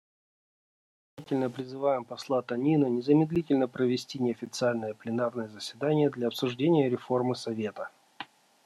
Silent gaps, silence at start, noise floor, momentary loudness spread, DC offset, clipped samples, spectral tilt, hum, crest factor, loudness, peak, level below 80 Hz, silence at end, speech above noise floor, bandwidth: none; 1.2 s; -48 dBFS; 12 LU; under 0.1%; under 0.1%; -6.5 dB/octave; none; 18 dB; -29 LUFS; -10 dBFS; -70 dBFS; 0.4 s; 19 dB; 13 kHz